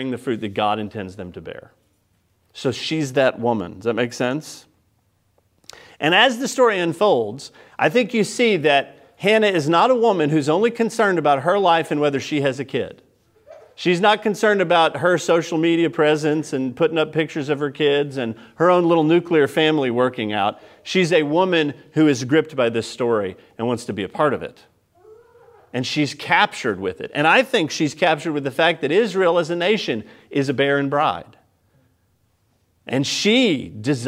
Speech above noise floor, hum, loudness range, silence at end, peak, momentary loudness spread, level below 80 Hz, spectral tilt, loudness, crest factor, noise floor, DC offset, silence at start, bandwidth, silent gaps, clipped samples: 45 dB; none; 6 LU; 0 s; 0 dBFS; 11 LU; -66 dBFS; -5 dB/octave; -19 LUFS; 20 dB; -64 dBFS; under 0.1%; 0 s; 15.5 kHz; none; under 0.1%